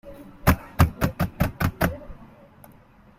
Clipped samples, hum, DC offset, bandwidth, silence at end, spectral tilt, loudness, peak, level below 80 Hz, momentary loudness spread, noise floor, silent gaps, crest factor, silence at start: under 0.1%; none; under 0.1%; 16 kHz; 0.95 s; -6.5 dB/octave; -24 LUFS; -2 dBFS; -36 dBFS; 18 LU; -52 dBFS; none; 24 dB; 0.05 s